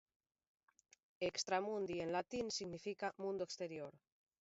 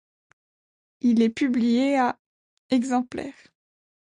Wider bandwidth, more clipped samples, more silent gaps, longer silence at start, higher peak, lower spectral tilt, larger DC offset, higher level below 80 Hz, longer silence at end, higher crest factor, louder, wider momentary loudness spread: second, 7.6 kHz vs 10 kHz; neither; second, none vs 2.19-2.69 s; first, 1.2 s vs 1.05 s; second, -24 dBFS vs -10 dBFS; second, -3 dB/octave vs -5.5 dB/octave; neither; second, -78 dBFS vs -66 dBFS; second, 0.45 s vs 0.85 s; about the same, 20 dB vs 16 dB; second, -43 LUFS vs -23 LUFS; second, 7 LU vs 14 LU